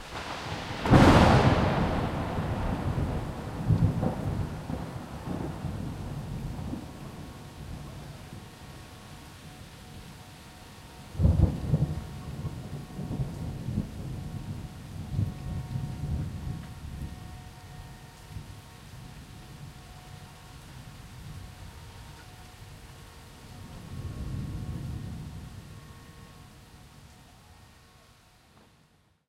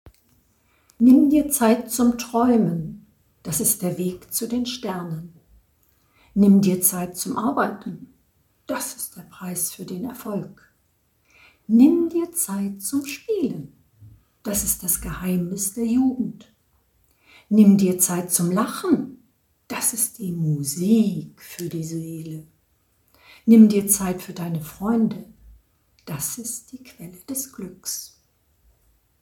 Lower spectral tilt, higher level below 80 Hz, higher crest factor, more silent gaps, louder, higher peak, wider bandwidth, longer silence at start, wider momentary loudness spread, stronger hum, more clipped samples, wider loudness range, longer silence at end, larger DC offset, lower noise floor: first, -7 dB/octave vs -5 dB/octave; first, -40 dBFS vs -52 dBFS; first, 26 dB vs 20 dB; neither; second, -30 LUFS vs -21 LUFS; about the same, -4 dBFS vs -2 dBFS; second, 15.5 kHz vs 19 kHz; about the same, 0 s vs 0.05 s; first, 21 LU vs 18 LU; neither; neither; first, 19 LU vs 8 LU; first, 1.55 s vs 1.15 s; neither; about the same, -64 dBFS vs -66 dBFS